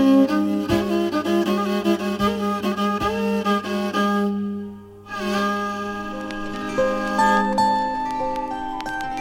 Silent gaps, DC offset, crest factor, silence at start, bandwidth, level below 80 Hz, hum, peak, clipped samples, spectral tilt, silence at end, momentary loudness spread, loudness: none; under 0.1%; 16 dB; 0 s; 16.5 kHz; -46 dBFS; none; -6 dBFS; under 0.1%; -5.5 dB/octave; 0 s; 11 LU; -22 LUFS